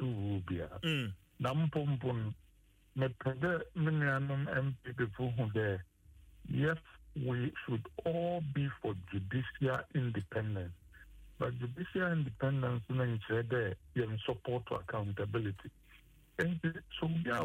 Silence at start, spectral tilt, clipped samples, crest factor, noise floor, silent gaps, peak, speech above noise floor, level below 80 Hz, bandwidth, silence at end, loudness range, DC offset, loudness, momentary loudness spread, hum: 0 s; -8 dB/octave; under 0.1%; 16 dB; -62 dBFS; none; -20 dBFS; 26 dB; -60 dBFS; 10.5 kHz; 0 s; 3 LU; under 0.1%; -37 LUFS; 7 LU; none